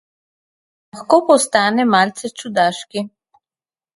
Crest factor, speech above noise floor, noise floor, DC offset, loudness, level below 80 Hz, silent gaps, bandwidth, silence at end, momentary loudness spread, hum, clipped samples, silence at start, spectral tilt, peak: 18 dB; over 74 dB; under -90 dBFS; under 0.1%; -16 LUFS; -66 dBFS; none; 11.5 kHz; 0.9 s; 15 LU; none; under 0.1%; 0.95 s; -3.5 dB/octave; 0 dBFS